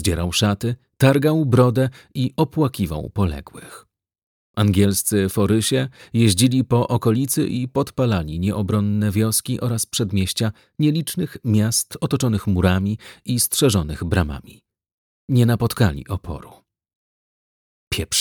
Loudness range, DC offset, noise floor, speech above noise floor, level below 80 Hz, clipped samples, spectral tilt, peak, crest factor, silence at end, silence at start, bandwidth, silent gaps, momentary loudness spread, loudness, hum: 4 LU; under 0.1%; under -90 dBFS; over 71 dB; -40 dBFS; under 0.1%; -5 dB/octave; -2 dBFS; 18 dB; 0 s; 0 s; 19.5 kHz; 4.23-4.54 s, 14.93-15.28 s, 16.95-17.91 s; 9 LU; -20 LUFS; none